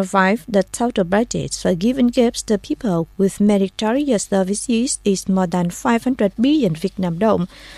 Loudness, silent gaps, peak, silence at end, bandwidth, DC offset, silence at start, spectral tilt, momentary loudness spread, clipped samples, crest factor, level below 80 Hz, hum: -18 LUFS; none; -2 dBFS; 0 s; 14 kHz; under 0.1%; 0 s; -5.5 dB/octave; 5 LU; under 0.1%; 16 dB; -46 dBFS; none